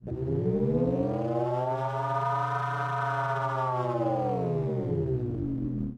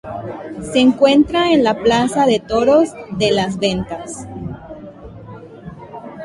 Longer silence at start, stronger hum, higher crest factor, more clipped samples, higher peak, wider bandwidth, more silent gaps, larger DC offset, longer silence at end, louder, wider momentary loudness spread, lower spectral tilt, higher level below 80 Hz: about the same, 0 s vs 0.05 s; neither; about the same, 14 dB vs 16 dB; neither; second, -14 dBFS vs -2 dBFS; second, 8.4 kHz vs 11.5 kHz; neither; neither; about the same, 0 s vs 0 s; second, -29 LUFS vs -15 LUFS; second, 4 LU vs 23 LU; first, -9 dB/octave vs -5 dB/octave; second, -50 dBFS vs -44 dBFS